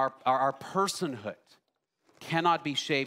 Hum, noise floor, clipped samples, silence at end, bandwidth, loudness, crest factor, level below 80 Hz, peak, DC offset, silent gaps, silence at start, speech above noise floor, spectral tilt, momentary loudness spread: none; -73 dBFS; under 0.1%; 0 s; 16 kHz; -29 LUFS; 20 dB; -80 dBFS; -10 dBFS; under 0.1%; none; 0 s; 43 dB; -4 dB/octave; 13 LU